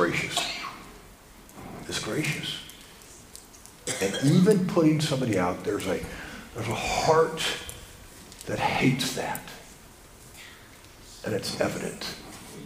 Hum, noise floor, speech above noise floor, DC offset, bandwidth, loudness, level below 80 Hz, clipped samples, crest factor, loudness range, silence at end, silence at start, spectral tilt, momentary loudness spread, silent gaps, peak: none; -50 dBFS; 24 dB; under 0.1%; 15.5 kHz; -27 LUFS; -52 dBFS; under 0.1%; 22 dB; 9 LU; 0 s; 0 s; -4.5 dB/octave; 24 LU; none; -8 dBFS